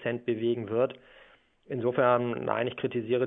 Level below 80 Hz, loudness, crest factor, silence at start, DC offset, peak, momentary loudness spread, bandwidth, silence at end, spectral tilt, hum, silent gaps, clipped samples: -70 dBFS; -29 LUFS; 20 dB; 0 s; under 0.1%; -10 dBFS; 8 LU; 3.9 kHz; 0 s; -10 dB/octave; none; none; under 0.1%